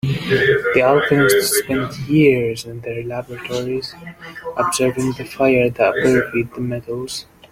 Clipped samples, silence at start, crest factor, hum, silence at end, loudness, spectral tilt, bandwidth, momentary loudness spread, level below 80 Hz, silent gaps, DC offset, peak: under 0.1%; 0.05 s; 18 dB; none; 0.3 s; -18 LUFS; -5 dB/octave; 16.5 kHz; 14 LU; -48 dBFS; none; under 0.1%; 0 dBFS